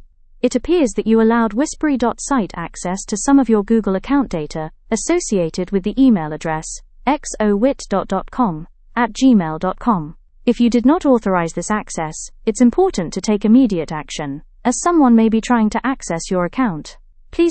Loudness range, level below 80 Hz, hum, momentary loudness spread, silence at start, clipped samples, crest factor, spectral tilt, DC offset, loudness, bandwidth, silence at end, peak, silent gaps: 3 LU; -38 dBFS; none; 11 LU; 0.45 s; under 0.1%; 16 dB; -5.5 dB/octave; under 0.1%; -17 LUFS; 8.8 kHz; 0 s; -2 dBFS; none